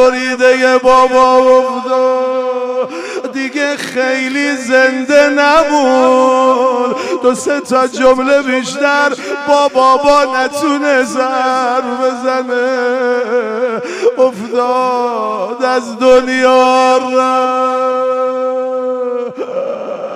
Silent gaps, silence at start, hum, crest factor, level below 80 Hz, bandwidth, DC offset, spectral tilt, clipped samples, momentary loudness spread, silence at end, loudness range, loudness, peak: none; 0 s; none; 12 dB; -48 dBFS; 12 kHz; under 0.1%; -3 dB/octave; under 0.1%; 9 LU; 0 s; 4 LU; -12 LUFS; 0 dBFS